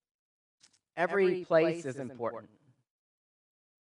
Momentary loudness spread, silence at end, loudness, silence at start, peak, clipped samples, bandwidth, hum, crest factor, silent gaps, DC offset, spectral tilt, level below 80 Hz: 14 LU; 1.35 s; -31 LUFS; 0.95 s; -12 dBFS; under 0.1%; 10.5 kHz; none; 20 dB; none; under 0.1%; -6.5 dB/octave; -86 dBFS